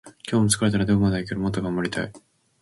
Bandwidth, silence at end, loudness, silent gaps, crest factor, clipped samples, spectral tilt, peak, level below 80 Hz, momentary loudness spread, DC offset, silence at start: 12 kHz; 0.45 s; -23 LUFS; none; 20 dB; under 0.1%; -5 dB/octave; -4 dBFS; -46 dBFS; 8 LU; under 0.1%; 0.05 s